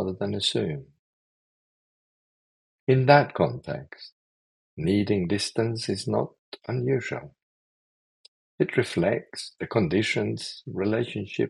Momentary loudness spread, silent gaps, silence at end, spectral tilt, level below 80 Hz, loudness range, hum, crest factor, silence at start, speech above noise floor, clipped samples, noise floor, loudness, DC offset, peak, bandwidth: 13 LU; 0.99-2.87 s, 4.12-4.77 s, 6.39-6.52 s, 7.43-8.58 s; 0 s; -6 dB/octave; -62 dBFS; 5 LU; none; 24 dB; 0 s; over 65 dB; under 0.1%; under -90 dBFS; -26 LUFS; under 0.1%; -2 dBFS; 12 kHz